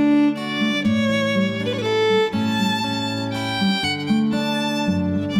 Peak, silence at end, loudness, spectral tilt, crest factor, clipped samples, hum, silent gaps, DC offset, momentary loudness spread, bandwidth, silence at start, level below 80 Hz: -8 dBFS; 0 s; -20 LUFS; -5.5 dB/octave; 12 dB; under 0.1%; none; none; under 0.1%; 4 LU; 15.5 kHz; 0 s; -54 dBFS